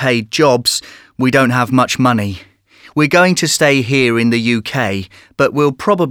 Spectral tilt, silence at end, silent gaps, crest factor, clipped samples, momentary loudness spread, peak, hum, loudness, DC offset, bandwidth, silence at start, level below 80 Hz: -4.5 dB/octave; 0 s; none; 14 dB; under 0.1%; 10 LU; 0 dBFS; none; -13 LUFS; under 0.1%; 18 kHz; 0 s; -52 dBFS